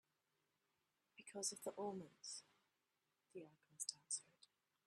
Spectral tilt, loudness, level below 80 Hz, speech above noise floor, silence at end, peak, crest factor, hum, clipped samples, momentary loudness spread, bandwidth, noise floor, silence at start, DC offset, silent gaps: -2 dB/octave; -49 LUFS; under -90 dBFS; 38 dB; 0.4 s; -26 dBFS; 28 dB; none; under 0.1%; 16 LU; 13 kHz; -89 dBFS; 1.15 s; under 0.1%; none